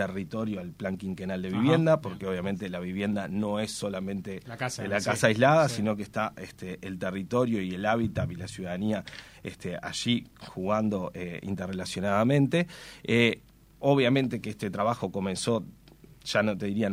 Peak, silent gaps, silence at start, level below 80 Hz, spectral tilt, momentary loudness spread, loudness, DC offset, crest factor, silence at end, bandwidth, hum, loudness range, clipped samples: -6 dBFS; none; 0 s; -58 dBFS; -5.5 dB/octave; 13 LU; -29 LUFS; under 0.1%; 22 dB; 0 s; 16 kHz; none; 5 LU; under 0.1%